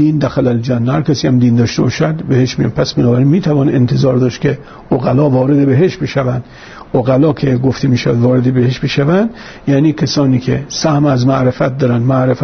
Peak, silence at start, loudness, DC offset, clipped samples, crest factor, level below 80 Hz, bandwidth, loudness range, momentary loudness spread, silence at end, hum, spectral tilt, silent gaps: -2 dBFS; 0 s; -13 LUFS; under 0.1%; under 0.1%; 10 dB; -42 dBFS; 6.6 kHz; 1 LU; 5 LU; 0 s; none; -7 dB/octave; none